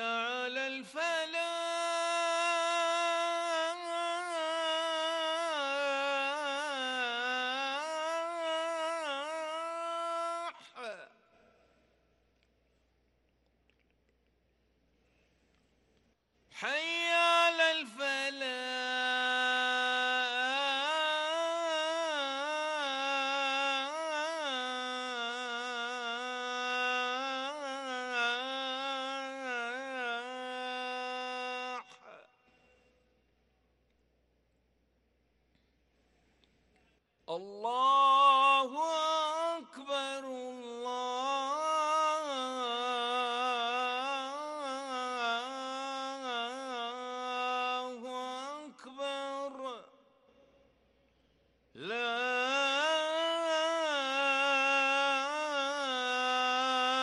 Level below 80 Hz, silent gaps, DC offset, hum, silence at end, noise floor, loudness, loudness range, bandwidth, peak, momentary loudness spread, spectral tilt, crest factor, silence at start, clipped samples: -82 dBFS; none; under 0.1%; none; 0 s; -74 dBFS; -32 LUFS; 12 LU; 12 kHz; -14 dBFS; 10 LU; -0.5 dB/octave; 20 dB; 0 s; under 0.1%